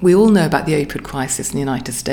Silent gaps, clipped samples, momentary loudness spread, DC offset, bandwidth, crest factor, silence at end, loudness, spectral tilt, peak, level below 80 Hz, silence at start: none; under 0.1%; 11 LU; under 0.1%; 19 kHz; 14 dB; 0 s; -17 LUFS; -5.5 dB/octave; -2 dBFS; -40 dBFS; 0 s